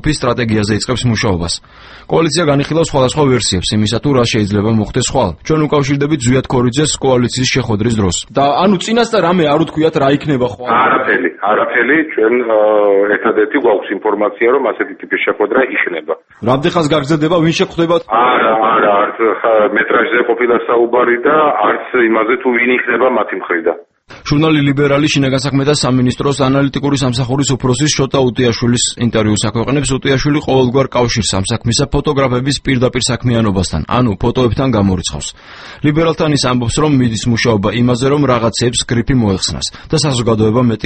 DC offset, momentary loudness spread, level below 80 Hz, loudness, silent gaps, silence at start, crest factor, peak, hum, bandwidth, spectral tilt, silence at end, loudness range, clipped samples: under 0.1%; 4 LU; -34 dBFS; -13 LUFS; none; 0.05 s; 12 dB; 0 dBFS; none; 8.8 kHz; -5 dB/octave; 0 s; 2 LU; under 0.1%